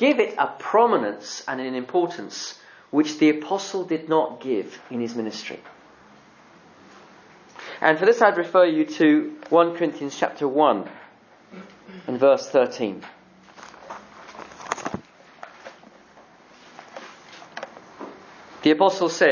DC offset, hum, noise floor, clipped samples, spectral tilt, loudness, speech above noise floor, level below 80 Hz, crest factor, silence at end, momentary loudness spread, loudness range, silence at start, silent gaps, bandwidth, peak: under 0.1%; none; -51 dBFS; under 0.1%; -4.5 dB/octave; -22 LUFS; 30 dB; -70 dBFS; 22 dB; 0 s; 23 LU; 17 LU; 0 s; none; 7.2 kHz; -2 dBFS